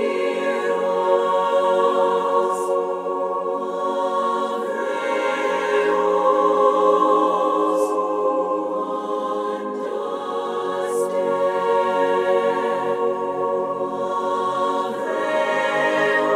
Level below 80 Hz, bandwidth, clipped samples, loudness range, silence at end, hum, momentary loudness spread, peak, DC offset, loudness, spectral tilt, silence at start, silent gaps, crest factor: -72 dBFS; 13.5 kHz; under 0.1%; 4 LU; 0 s; none; 7 LU; -4 dBFS; under 0.1%; -21 LUFS; -4.5 dB/octave; 0 s; none; 16 dB